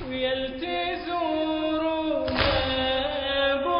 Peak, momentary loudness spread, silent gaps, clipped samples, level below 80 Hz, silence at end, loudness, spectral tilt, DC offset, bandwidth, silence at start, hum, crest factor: -10 dBFS; 5 LU; none; under 0.1%; -42 dBFS; 0 s; -26 LUFS; -9 dB/octave; under 0.1%; 5.4 kHz; 0 s; none; 16 dB